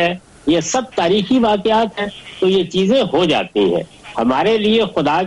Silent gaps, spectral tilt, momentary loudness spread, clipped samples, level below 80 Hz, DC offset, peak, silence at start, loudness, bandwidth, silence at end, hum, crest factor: none; -5 dB/octave; 7 LU; under 0.1%; -48 dBFS; under 0.1%; -6 dBFS; 0 s; -16 LUFS; 11.5 kHz; 0 s; none; 10 dB